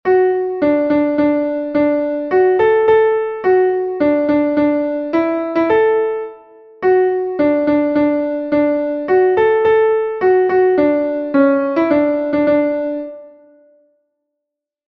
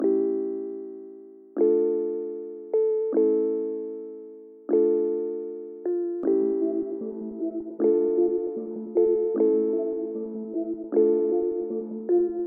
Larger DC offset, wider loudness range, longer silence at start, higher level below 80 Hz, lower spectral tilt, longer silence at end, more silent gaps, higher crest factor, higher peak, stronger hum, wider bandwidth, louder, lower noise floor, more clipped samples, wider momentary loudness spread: neither; about the same, 3 LU vs 2 LU; about the same, 0.05 s vs 0 s; first, -54 dBFS vs -70 dBFS; second, -8.5 dB/octave vs -13.5 dB/octave; first, 1.6 s vs 0 s; neither; about the same, 14 dB vs 16 dB; first, -2 dBFS vs -10 dBFS; neither; first, 5.4 kHz vs 2.3 kHz; first, -15 LUFS vs -26 LUFS; first, -80 dBFS vs -45 dBFS; neither; second, 6 LU vs 14 LU